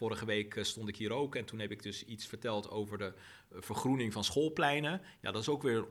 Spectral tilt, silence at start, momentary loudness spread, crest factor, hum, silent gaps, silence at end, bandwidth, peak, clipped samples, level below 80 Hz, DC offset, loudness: -4.5 dB/octave; 0 s; 12 LU; 20 dB; none; none; 0 s; 16 kHz; -18 dBFS; under 0.1%; -68 dBFS; under 0.1%; -37 LUFS